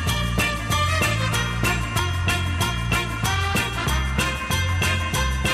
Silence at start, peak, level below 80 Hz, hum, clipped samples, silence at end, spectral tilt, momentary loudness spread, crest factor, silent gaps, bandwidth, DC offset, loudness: 0 s; -6 dBFS; -30 dBFS; none; under 0.1%; 0 s; -4 dB/octave; 2 LU; 16 dB; none; 15.5 kHz; under 0.1%; -22 LUFS